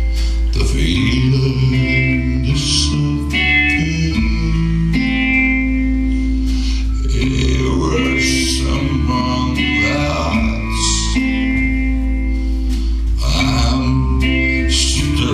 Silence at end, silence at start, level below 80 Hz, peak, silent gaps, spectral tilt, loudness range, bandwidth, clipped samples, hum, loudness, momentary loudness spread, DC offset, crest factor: 0 s; 0 s; -18 dBFS; -2 dBFS; none; -4.5 dB/octave; 2 LU; 12.5 kHz; under 0.1%; none; -16 LUFS; 5 LU; under 0.1%; 14 dB